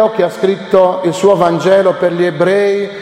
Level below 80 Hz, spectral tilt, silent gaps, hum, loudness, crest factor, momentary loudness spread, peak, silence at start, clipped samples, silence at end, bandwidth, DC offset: -54 dBFS; -6 dB/octave; none; none; -12 LUFS; 12 dB; 4 LU; 0 dBFS; 0 s; under 0.1%; 0 s; 13.5 kHz; under 0.1%